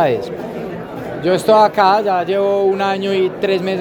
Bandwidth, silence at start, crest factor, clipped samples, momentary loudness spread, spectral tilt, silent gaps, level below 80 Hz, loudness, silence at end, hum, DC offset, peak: 19 kHz; 0 s; 16 dB; under 0.1%; 15 LU; -6 dB/octave; none; -52 dBFS; -15 LUFS; 0 s; none; under 0.1%; 0 dBFS